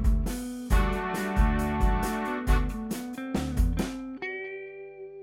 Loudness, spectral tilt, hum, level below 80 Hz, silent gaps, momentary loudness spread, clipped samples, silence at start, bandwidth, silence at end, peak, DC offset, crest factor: -29 LUFS; -6 dB/octave; 50 Hz at -40 dBFS; -30 dBFS; none; 10 LU; under 0.1%; 0 s; 16.5 kHz; 0 s; -10 dBFS; under 0.1%; 16 dB